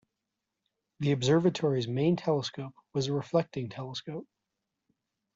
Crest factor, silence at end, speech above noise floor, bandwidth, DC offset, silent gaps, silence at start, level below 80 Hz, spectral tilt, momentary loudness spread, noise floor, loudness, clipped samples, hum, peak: 18 dB; 1.15 s; 57 dB; 7.8 kHz; under 0.1%; none; 1 s; -68 dBFS; -6 dB/octave; 13 LU; -86 dBFS; -30 LUFS; under 0.1%; none; -12 dBFS